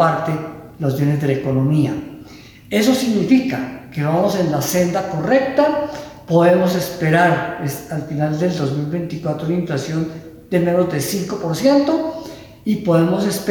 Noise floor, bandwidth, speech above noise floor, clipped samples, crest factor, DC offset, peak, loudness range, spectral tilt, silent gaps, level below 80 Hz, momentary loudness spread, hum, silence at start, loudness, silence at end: -40 dBFS; over 20 kHz; 23 dB; under 0.1%; 14 dB; under 0.1%; -2 dBFS; 4 LU; -6 dB/octave; none; -52 dBFS; 11 LU; none; 0 s; -18 LUFS; 0 s